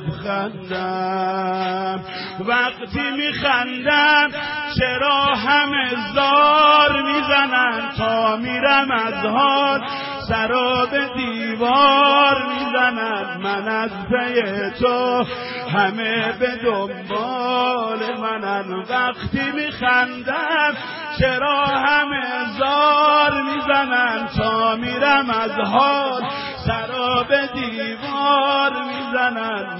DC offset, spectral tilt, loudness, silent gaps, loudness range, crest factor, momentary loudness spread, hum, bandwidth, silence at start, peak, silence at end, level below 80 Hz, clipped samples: under 0.1%; -8.5 dB/octave; -18 LUFS; none; 5 LU; 16 dB; 10 LU; none; 5.8 kHz; 0 s; -4 dBFS; 0 s; -46 dBFS; under 0.1%